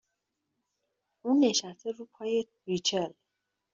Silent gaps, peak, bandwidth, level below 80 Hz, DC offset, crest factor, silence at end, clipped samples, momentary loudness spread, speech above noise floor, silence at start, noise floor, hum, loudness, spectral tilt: none; -14 dBFS; 7.6 kHz; -76 dBFS; under 0.1%; 20 dB; 0.65 s; under 0.1%; 14 LU; 54 dB; 1.25 s; -84 dBFS; none; -30 LUFS; -4 dB/octave